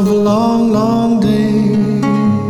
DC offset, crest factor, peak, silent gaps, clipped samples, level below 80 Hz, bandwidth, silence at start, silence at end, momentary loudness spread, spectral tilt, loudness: under 0.1%; 10 dB; -2 dBFS; none; under 0.1%; -40 dBFS; 13 kHz; 0 s; 0 s; 1 LU; -8 dB/octave; -13 LUFS